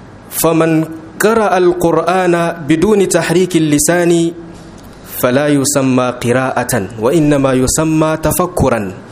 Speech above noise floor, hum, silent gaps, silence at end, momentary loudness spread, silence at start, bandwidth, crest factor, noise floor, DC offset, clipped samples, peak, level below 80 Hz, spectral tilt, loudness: 21 dB; none; none; 0 s; 6 LU; 0 s; 16 kHz; 12 dB; -33 dBFS; under 0.1%; under 0.1%; 0 dBFS; -36 dBFS; -5 dB/octave; -12 LUFS